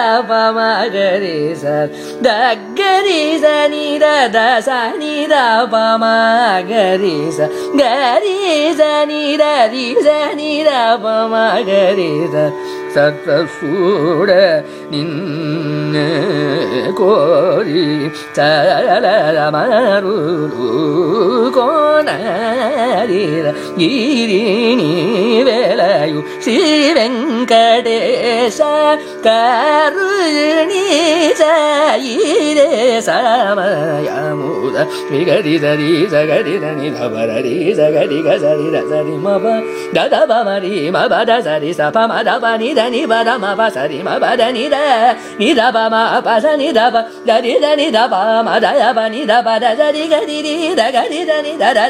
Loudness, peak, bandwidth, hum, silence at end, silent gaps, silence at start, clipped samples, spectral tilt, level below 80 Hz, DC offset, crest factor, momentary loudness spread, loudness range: -13 LUFS; 0 dBFS; 14.5 kHz; none; 0 s; none; 0 s; under 0.1%; -4.5 dB/octave; -62 dBFS; under 0.1%; 12 dB; 6 LU; 2 LU